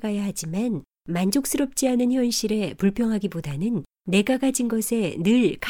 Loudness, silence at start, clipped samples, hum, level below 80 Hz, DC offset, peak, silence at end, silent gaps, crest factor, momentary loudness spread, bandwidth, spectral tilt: -24 LUFS; 0 s; under 0.1%; none; -52 dBFS; under 0.1%; -8 dBFS; 0 s; none; 14 dB; 7 LU; 18 kHz; -5 dB/octave